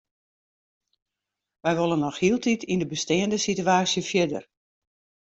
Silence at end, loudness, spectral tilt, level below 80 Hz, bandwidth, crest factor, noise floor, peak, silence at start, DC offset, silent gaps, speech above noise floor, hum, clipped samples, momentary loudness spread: 0.8 s; -24 LUFS; -4.5 dB/octave; -62 dBFS; 8.2 kHz; 18 dB; -86 dBFS; -8 dBFS; 1.65 s; under 0.1%; none; 62 dB; none; under 0.1%; 5 LU